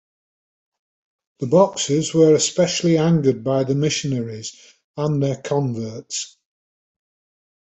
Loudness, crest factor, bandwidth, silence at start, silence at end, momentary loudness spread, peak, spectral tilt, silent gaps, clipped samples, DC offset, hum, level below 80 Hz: -19 LUFS; 18 dB; 8.4 kHz; 1.4 s; 1.45 s; 14 LU; -2 dBFS; -5 dB/octave; 4.84-4.94 s; under 0.1%; under 0.1%; none; -60 dBFS